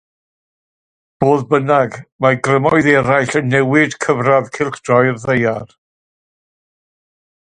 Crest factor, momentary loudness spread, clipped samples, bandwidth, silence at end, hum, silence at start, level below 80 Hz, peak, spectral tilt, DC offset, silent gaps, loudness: 16 dB; 7 LU; under 0.1%; 10 kHz; 1.8 s; none; 1.2 s; -52 dBFS; 0 dBFS; -6.5 dB/octave; under 0.1%; 2.12-2.19 s; -14 LUFS